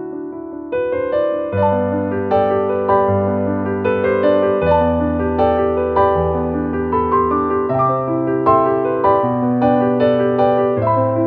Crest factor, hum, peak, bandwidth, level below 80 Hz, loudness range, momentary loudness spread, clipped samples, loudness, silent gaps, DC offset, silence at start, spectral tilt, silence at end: 14 dB; none; -2 dBFS; 4.8 kHz; -38 dBFS; 2 LU; 5 LU; under 0.1%; -16 LUFS; none; under 0.1%; 0 s; -10.5 dB/octave; 0 s